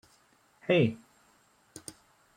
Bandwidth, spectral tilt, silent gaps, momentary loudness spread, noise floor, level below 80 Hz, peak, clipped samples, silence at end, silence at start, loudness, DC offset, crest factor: 16.5 kHz; -6 dB/octave; none; 23 LU; -66 dBFS; -72 dBFS; -14 dBFS; under 0.1%; 1.4 s; 0.7 s; -28 LUFS; under 0.1%; 20 dB